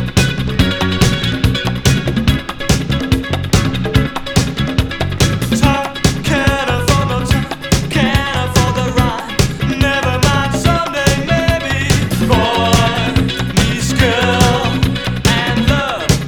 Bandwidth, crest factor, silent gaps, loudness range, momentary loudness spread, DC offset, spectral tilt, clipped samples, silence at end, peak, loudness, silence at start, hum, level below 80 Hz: 20 kHz; 14 dB; none; 2 LU; 4 LU; under 0.1%; -5 dB/octave; under 0.1%; 0 s; 0 dBFS; -14 LUFS; 0 s; none; -24 dBFS